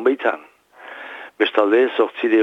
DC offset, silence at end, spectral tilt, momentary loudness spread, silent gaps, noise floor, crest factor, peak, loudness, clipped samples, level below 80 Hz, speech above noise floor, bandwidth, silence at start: under 0.1%; 0 s; -5 dB/octave; 19 LU; none; -41 dBFS; 16 dB; -2 dBFS; -18 LUFS; under 0.1%; -78 dBFS; 24 dB; 5.6 kHz; 0 s